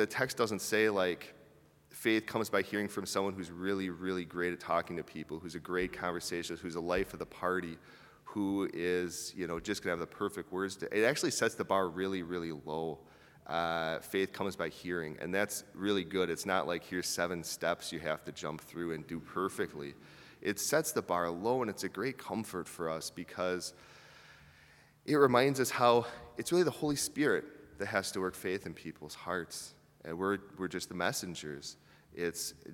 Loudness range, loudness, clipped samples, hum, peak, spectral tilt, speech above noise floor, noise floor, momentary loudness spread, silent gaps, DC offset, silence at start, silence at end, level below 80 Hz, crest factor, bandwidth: 7 LU; -35 LUFS; under 0.1%; none; -12 dBFS; -4 dB/octave; 28 dB; -62 dBFS; 13 LU; none; under 0.1%; 0 s; 0 s; -66 dBFS; 24 dB; 18 kHz